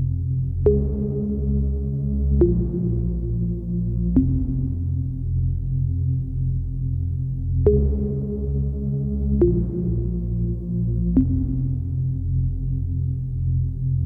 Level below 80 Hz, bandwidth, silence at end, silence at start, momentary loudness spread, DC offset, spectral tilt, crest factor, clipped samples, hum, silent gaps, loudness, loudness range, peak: -28 dBFS; 1.5 kHz; 0 s; 0 s; 6 LU; under 0.1%; -14.5 dB/octave; 18 dB; under 0.1%; none; none; -23 LUFS; 1 LU; -4 dBFS